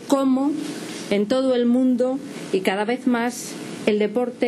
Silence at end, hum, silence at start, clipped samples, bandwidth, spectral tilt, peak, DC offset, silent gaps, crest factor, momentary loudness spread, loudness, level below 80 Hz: 0 s; none; 0 s; under 0.1%; 13.5 kHz; -5 dB/octave; -6 dBFS; under 0.1%; none; 16 dB; 11 LU; -22 LUFS; -66 dBFS